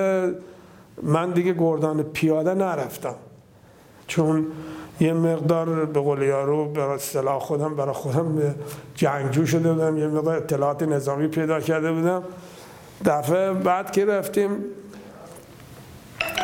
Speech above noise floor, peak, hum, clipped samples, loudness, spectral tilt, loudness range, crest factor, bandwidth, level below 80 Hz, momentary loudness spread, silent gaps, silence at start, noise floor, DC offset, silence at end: 28 dB; -6 dBFS; none; under 0.1%; -23 LUFS; -6.5 dB/octave; 2 LU; 18 dB; 17 kHz; -60 dBFS; 19 LU; none; 0 s; -51 dBFS; under 0.1%; 0 s